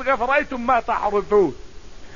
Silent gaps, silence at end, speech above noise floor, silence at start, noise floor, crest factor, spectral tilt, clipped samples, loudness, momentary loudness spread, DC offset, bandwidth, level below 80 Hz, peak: none; 0 s; 20 dB; 0 s; -39 dBFS; 16 dB; -6 dB/octave; under 0.1%; -20 LUFS; 3 LU; 1%; 7.4 kHz; -42 dBFS; -6 dBFS